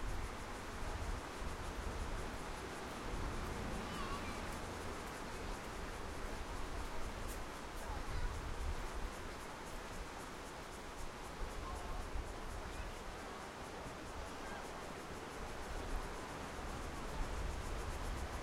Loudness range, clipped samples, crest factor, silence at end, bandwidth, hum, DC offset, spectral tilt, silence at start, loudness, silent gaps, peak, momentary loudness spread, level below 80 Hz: 3 LU; under 0.1%; 16 dB; 0 s; 16.5 kHz; none; under 0.1%; -4.5 dB/octave; 0 s; -46 LUFS; none; -28 dBFS; 4 LU; -48 dBFS